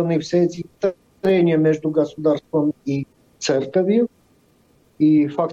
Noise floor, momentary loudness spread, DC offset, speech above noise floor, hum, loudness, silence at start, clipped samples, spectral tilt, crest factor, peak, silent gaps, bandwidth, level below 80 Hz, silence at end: -57 dBFS; 9 LU; under 0.1%; 39 dB; none; -20 LUFS; 0 s; under 0.1%; -7 dB/octave; 12 dB; -6 dBFS; none; 7.8 kHz; -62 dBFS; 0 s